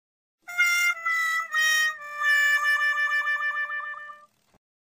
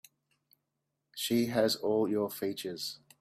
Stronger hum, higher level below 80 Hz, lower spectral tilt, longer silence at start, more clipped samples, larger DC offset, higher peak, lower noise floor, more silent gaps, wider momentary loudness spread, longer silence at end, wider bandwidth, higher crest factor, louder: neither; second, -84 dBFS vs -74 dBFS; second, 4 dB/octave vs -4.5 dB/octave; second, 0.5 s vs 1.15 s; neither; neither; about the same, -12 dBFS vs -14 dBFS; second, -49 dBFS vs -84 dBFS; neither; about the same, 12 LU vs 10 LU; first, 0.65 s vs 0.25 s; about the same, 15.5 kHz vs 16 kHz; second, 14 dB vs 20 dB; first, -23 LUFS vs -32 LUFS